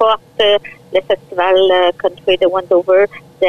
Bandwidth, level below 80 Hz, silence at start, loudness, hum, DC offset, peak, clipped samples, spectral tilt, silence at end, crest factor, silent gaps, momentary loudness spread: 6.6 kHz; -52 dBFS; 0 s; -14 LUFS; none; 0.9%; -2 dBFS; under 0.1%; -5 dB/octave; 0 s; 10 dB; none; 7 LU